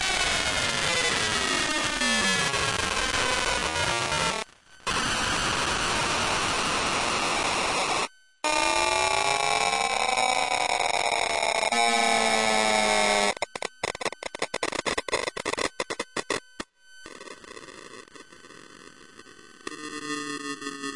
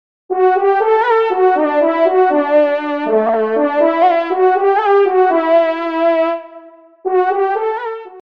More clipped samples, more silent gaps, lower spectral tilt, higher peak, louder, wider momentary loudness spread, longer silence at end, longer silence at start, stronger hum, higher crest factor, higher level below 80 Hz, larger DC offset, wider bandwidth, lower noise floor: neither; neither; second, -1.5 dB/octave vs -6.5 dB/octave; second, -8 dBFS vs -2 dBFS; second, -25 LUFS vs -14 LUFS; first, 14 LU vs 7 LU; second, 0 s vs 0.2 s; second, 0 s vs 0.3 s; neither; first, 20 dB vs 12 dB; first, -50 dBFS vs -68 dBFS; second, under 0.1% vs 0.3%; first, 11.5 kHz vs 5.6 kHz; first, -50 dBFS vs -39 dBFS